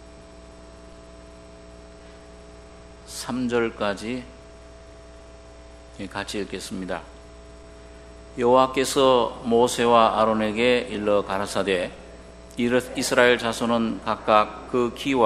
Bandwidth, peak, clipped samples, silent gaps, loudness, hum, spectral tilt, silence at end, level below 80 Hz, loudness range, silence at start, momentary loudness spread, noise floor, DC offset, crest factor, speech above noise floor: 13 kHz; 0 dBFS; under 0.1%; none; -22 LUFS; 60 Hz at -45 dBFS; -4 dB/octave; 0 s; -48 dBFS; 15 LU; 0 s; 16 LU; -45 dBFS; under 0.1%; 24 dB; 23 dB